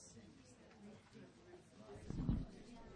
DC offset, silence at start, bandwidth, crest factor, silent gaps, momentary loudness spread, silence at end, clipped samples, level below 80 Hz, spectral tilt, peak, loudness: under 0.1%; 0 s; 10 kHz; 22 dB; none; 19 LU; 0 s; under 0.1%; -56 dBFS; -7 dB/octave; -28 dBFS; -49 LUFS